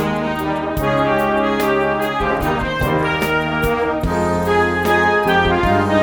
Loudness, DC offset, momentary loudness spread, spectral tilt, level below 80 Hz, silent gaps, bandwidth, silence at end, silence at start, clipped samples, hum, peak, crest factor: -17 LUFS; under 0.1%; 5 LU; -6 dB/octave; -32 dBFS; none; over 20 kHz; 0 s; 0 s; under 0.1%; none; -4 dBFS; 14 dB